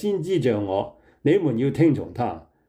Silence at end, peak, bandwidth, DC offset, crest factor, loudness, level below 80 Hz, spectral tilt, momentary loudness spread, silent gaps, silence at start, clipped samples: 0.3 s; -8 dBFS; 11 kHz; under 0.1%; 14 dB; -23 LUFS; -58 dBFS; -8 dB/octave; 9 LU; none; 0 s; under 0.1%